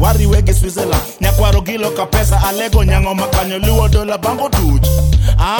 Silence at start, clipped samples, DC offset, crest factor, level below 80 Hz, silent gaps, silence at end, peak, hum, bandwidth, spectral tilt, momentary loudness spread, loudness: 0 s; under 0.1%; under 0.1%; 12 dB; -14 dBFS; none; 0 s; 0 dBFS; none; over 20 kHz; -5.5 dB/octave; 4 LU; -14 LUFS